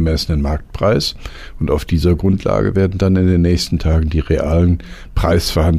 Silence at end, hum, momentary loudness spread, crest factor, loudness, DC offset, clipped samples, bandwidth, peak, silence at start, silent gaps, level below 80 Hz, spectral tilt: 0 s; none; 8 LU; 12 dB; -16 LUFS; under 0.1%; under 0.1%; 15 kHz; -4 dBFS; 0 s; none; -24 dBFS; -6.5 dB/octave